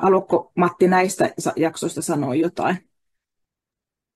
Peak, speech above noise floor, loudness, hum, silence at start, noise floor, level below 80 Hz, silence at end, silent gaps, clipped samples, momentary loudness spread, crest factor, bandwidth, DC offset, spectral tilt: -6 dBFS; 67 dB; -21 LUFS; none; 0 s; -87 dBFS; -64 dBFS; 1.4 s; none; under 0.1%; 7 LU; 16 dB; 12.5 kHz; under 0.1%; -5.5 dB/octave